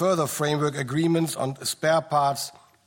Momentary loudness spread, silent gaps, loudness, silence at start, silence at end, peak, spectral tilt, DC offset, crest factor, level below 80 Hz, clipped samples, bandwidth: 6 LU; none; -24 LUFS; 0 s; 0.35 s; -10 dBFS; -5 dB/octave; under 0.1%; 14 dB; -66 dBFS; under 0.1%; 17 kHz